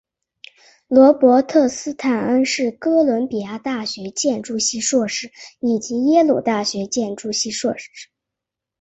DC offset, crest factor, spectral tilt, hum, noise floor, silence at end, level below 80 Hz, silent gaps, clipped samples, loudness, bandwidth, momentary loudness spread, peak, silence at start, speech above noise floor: under 0.1%; 18 dB; -3.5 dB/octave; none; -84 dBFS; 0.75 s; -62 dBFS; none; under 0.1%; -18 LUFS; 8.4 kHz; 12 LU; -2 dBFS; 0.9 s; 66 dB